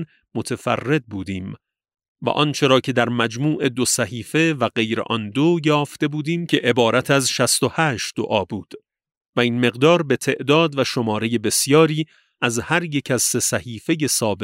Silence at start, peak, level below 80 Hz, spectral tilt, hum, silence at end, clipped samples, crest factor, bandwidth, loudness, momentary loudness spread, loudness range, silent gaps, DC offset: 0 s; -2 dBFS; -60 dBFS; -4 dB/octave; none; 0 s; under 0.1%; 18 dB; 16 kHz; -19 LUFS; 10 LU; 2 LU; 2.08-2.15 s, 9.17-9.21 s, 9.28-9.33 s; under 0.1%